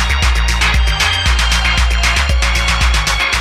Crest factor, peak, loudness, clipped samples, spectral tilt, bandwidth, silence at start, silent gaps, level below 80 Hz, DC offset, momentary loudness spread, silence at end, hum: 12 dB; 0 dBFS; -13 LUFS; under 0.1%; -2.5 dB/octave; 14.5 kHz; 0 s; none; -16 dBFS; under 0.1%; 1 LU; 0 s; none